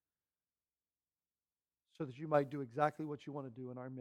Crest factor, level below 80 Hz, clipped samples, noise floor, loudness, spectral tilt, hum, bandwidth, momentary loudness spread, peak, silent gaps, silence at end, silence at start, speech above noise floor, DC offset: 24 dB; -84 dBFS; under 0.1%; under -90 dBFS; -40 LUFS; -8 dB/octave; 60 Hz at -80 dBFS; 10.5 kHz; 12 LU; -18 dBFS; none; 0 s; 2 s; over 50 dB; under 0.1%